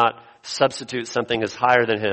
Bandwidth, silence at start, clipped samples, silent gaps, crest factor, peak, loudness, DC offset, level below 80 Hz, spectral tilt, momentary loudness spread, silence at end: 8.8 kHz; 0 s; under 0.1%; none; 20 dB; -2 dBFS; -21 LUFS; under 0.1%; -60 dBFS; -4 dB/octave; 12 LU; 0 s